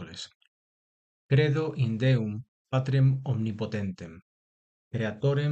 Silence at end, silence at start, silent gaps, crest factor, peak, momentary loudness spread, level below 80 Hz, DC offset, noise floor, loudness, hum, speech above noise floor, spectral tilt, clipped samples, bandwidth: 0 s; 0 s; 0.35-0.40 s, 0.47-1.29 s, 2.48-2.65 s, 4.22-4.91 s; 18 dB; -10 dBFS; 17 LU; -60 dBFS; under 0.1%; under -90 dBFS; -28 LUFS; none; over 64 dB; -8 dB/octave; under 0.1%; 8 kHz